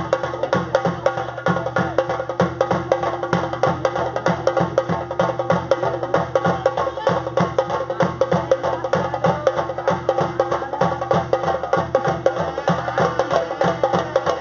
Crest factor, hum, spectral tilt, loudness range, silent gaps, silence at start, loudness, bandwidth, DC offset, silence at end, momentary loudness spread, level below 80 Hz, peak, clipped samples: 20 dB; none; -5 dB/octave; 1 LU; none; 0 s; -21 LUFS; 7.2 kHz; under 0.1%; 0 s; 3 LU; -48 dBFS; -2 dBFS; under 0.1%